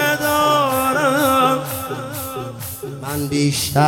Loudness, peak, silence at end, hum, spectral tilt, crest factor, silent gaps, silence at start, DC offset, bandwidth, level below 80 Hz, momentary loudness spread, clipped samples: -18 LUFS; -2 dBFS; 0 s; none; -4 dB/octave; 16 dB; none; 0 s; under 0.1%; 17.5 kHz; -50 dBFS; 13 LU; under 0.1%